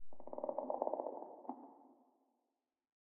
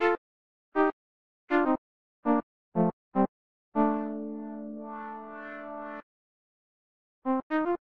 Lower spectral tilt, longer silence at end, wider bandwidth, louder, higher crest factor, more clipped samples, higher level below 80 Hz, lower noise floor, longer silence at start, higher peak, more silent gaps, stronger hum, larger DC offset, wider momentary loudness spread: second, -4.5 dB/octave vs -9 dB/octave; about the same, 0.3 s vs 0.2 s; second, 2.4 kHz vs 6 kHz; second, -45 LUFS vs -31 LUFS; first, 26 dB vs 18 dB; neither; second, -82 dBFS vs -66 dBFS; about the same, -89 dBFS vs under -90 dBFS; about the same, 0 s vs 0 s; second, -20 dBFS vs -12 dBFS; second, none vs 0.18-0.72 s, 0.93-1.47 s, 1.78-2.23 s, 2.43-2.72 s, 2.93-3.12 s, 3.28-3.72 s, 6.03-7.22 s, 7.43-7.50 s; neither; neither; first, 16 LU vs 13 LU